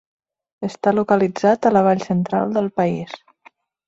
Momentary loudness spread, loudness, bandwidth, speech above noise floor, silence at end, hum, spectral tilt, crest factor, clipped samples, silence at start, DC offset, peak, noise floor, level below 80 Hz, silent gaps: 14 LU; -18 LUFS; 7.8 kHz; 35 dB; 0.7 s; none; -7.5 dB/octave; 16 dB; under 0.1%; 0.6 s; under 0.1%; -4 dBFS; -53 dBFS; -60 dBFS; none